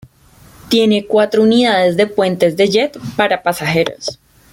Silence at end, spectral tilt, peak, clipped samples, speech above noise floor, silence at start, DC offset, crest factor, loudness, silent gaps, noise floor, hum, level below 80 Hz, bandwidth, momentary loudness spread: 0.4 s; -5 dB/octave; -2 dBFS; under 0.1%; 32 dB; 0.65 s; under 0.1%; 14 dB; -14 LUFS; none; -45 dBFS; none; -52 dBFS; 17 kHz; 7 LU